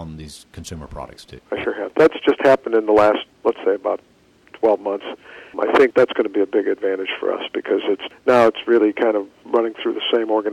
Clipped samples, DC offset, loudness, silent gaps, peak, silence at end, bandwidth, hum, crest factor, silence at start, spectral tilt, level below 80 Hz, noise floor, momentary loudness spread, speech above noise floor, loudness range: under 0.1%; under 0.1%; -19 LUFS; none; -6 dBFS; 0 s; 12 kHz; none; 14 dB; 0 s; -5.5 dB/octave; -52 dBFS; -47 dBFS; 19 LU; 29 dB; 2 LU